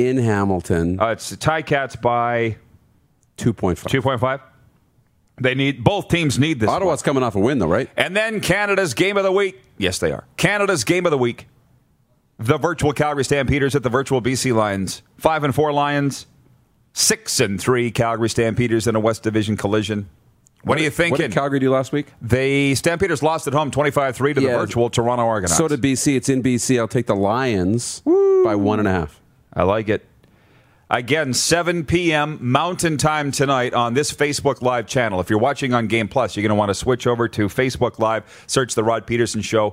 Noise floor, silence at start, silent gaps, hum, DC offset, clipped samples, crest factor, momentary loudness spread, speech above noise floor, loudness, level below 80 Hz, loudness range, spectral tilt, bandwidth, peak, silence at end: -60 dBFS; 0 s; none; none; under 0.1%; under 0.1%; 20 dB; 5 LU; 42 dB; -19 LUFS; -46 dBFS; 3 LU; -4.5 dB/octave; 16 kHz; 0 dBFS; 0 s